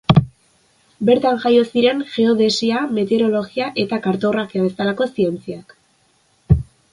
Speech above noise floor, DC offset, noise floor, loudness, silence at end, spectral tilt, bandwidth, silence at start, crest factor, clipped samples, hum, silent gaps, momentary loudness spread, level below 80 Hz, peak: 42 dB; under 0.1%; -59 dBFS; -18 LUFS; 0.3 s; -6.5 dB/octave; 11.5 kHz; 0.1 s; 18 dB; under 0.1%; none; none; 6 LU; -36 dBFS; 0 dBFS